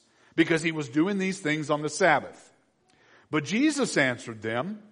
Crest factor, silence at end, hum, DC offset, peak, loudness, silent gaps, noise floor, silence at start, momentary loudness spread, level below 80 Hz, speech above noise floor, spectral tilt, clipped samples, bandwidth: 20 dB; 0.15 s; none; under 0.1%; -8 dBFS; -26 LUFS; none; -65 dBFS; 0.35 s; 9 LU; -72 dBFS; 38 dB; -4.5 dB/octave; under 0.1%; 10.5 kHz